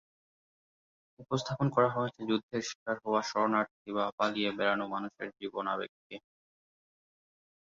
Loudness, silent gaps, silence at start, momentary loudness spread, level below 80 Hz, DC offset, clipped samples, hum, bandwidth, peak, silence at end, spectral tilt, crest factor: -33 LUFS; 2.43-2.49 s, 2.75-2.86 s, 3.71-3.85 s, 4.12-4.18 s, 5.89-6.10 s; 1.2 s; 12 LU; -72 dBFS; under 0.1%; under 0.1%; none; 7.4 kHz; -12 dBFS; 1.55 s; -4 dB/octave; 22 dB